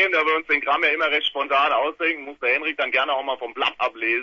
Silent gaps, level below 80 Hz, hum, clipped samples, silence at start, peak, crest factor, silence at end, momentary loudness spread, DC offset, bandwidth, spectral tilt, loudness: none; -68 dBFS; none; under 0.1%; 0 s; -6 dBFS; 16 dB; 0 s; 5 LU; under 0.1%; 7.2 kHz; -3 dB/octave; -21 LUFS